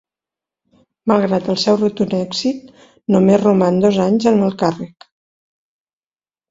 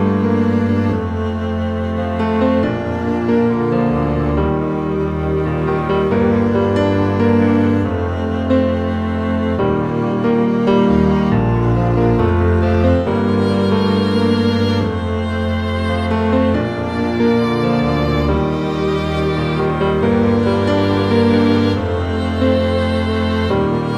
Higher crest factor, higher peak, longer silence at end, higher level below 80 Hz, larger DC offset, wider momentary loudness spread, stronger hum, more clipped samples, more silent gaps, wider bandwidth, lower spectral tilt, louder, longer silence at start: about the same, 18 dB vs 14 dB; about the same, 0 dBFS vs 0 dBFS; first, 1.65 s vs 0 s; second, -56 dBFS vs -30 dBFS; second, under 0.1% vs 0.3%; first, 12 LU vs 5 LU; neither; neither; neither; second, 7.8 kHz vs 10 kHz; second, -6.5 dB/octave vs -8.5 dB/octave; about the same, -16 LUFS vs -16 LUFS; first, 1.05 s vs 0 s